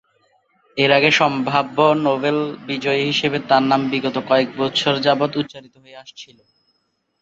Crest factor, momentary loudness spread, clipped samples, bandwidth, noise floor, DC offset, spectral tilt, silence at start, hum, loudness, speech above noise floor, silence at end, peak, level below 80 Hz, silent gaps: 18 dB; 11 LU; under 0.1%; 8 kHz; -69 dBFS; under 0.1%; -5 dB/octave; 0.75 s; none; -18 LUFS; 51 dB; 1 s; 0 dBFS; -62 dBFS; none